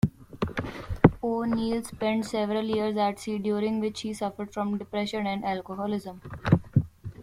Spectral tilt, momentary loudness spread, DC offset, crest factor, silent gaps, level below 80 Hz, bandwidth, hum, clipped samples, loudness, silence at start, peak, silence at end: -7 dB/octave; 10 LU; under 0.1%; 26 dB; none; -48 dBFS; 14.5 kHz; none; under 0.1%; -28 LUFS; 0.05 s; -2 dBFS; 0 s